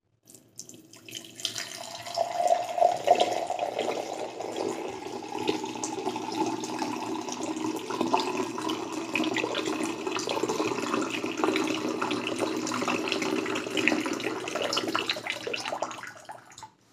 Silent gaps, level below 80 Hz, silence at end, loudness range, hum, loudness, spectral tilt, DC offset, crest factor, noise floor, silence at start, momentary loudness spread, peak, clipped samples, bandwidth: none; -76 dBFS; 0.25 s; 4 LU; none; -30 LUFS; -3 dB/octave; under 0.1%; 26 dB; -56 dBFS; 0.3 s; 12 LU; -4 dBFS; under 0.1%; 15.5 kHz